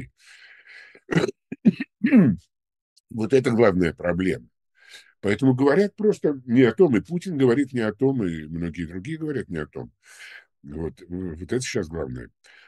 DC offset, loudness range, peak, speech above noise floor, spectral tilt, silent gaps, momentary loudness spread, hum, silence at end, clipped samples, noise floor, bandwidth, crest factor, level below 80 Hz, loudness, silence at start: under 0.1%; 10 LU; -4 dBFS; 28 dB; -7 dB/octave; 2.81-3.04 s; 16 LU; none; 0.4 s; under 0.1%; -50 dBFS; 12 kHz; 18 dB; -52 dBFS; -23 LUFS; 0 s